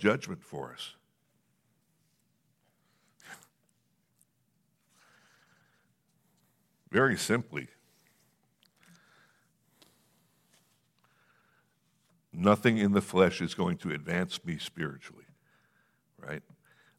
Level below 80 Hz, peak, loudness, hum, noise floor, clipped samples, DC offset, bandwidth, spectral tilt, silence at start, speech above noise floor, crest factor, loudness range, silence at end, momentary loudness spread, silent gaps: -70 dBFS; -8 dBFS; -30 LUFS; none; -74 dBFS; under 0.1%; under 0.1%; 15.5 kHz; -5.5 dB/octave; 0 s; 45 dB; 26 dB; 13 LU; 0.6 s; 24 LU; none